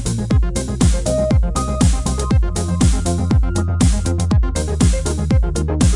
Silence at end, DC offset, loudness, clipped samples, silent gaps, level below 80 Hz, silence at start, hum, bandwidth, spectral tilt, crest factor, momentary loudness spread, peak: 0 s; under 0.1%; -17 LUFS; under 0.1%; none; -20 dBFS; 0 s; none; 11.5 kHz; -6 dB/octave; 12 dB; 4 LU; -4 dBFS